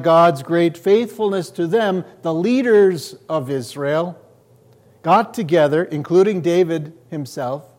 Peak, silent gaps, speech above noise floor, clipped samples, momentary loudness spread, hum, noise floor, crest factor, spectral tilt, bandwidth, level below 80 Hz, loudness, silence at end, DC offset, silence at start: -2 dBFS; none; 34 dB; under 0.1%; 12 LU; none; -51 dBFS; 14 dB; -6.5 dB/octave; 16 kHz; -68 dBFS; -18 LUFS; 0.15 s; under 0.1%; 0 s